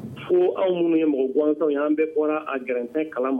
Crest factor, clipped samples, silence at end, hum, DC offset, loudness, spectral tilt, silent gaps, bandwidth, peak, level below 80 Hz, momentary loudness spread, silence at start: 12 dB; under 0.1%; 0 s; none; under 0.1%; -23 LUFS; -8.5 dB/octave; none; 3.7 kHz; -10 dBFS; -70 dBFS; 6 LU; 0 s